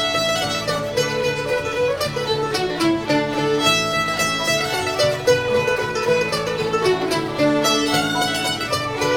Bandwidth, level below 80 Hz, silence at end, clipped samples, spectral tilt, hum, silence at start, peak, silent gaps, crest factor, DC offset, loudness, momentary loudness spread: over 20 kHz; -48 dBFS; 0 s; under 0.1%; -3.5 dB/octave; none; 0 s; -4 dBFS; none; 16 dB; 0.1%; -19 LUFS; 5 LU